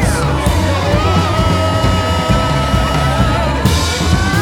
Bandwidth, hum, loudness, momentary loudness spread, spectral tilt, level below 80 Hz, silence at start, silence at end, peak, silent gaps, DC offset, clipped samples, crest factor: 17.5 kHz; none; -14 LUFS; 1 LU; -5.5 dB/octave; -22 dBFS; 0 s; 0 s; 0 dBFS; none; under 0.1%; under 0.1%; 12 dB